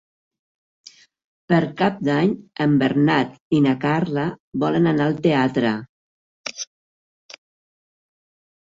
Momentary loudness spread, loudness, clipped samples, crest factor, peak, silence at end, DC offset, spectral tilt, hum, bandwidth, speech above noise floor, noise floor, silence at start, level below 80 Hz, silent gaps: 13 LU; -20 LUFS; under 0.1%; 18 dB; -4 dBFS; 2 s; under 0.1%; -6.5 dB/octave; none; 7.6 kHz; over 71 dB; under -90 dBFS; 1.5 s; -60 dBFS; 3.41-3.51 s, 4.40-4.52 s, 5.89-6.44 s